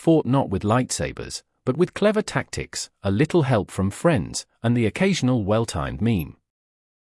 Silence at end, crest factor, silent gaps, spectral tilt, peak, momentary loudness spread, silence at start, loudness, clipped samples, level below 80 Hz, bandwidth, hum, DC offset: 0.7 s; 16 dB; none; -6 dB/octave; -6 dBFS; 9 LU; 0 s; -23 LUFS; under 0.1%; -48 dBFS; 12 kHz; none; under 0.1%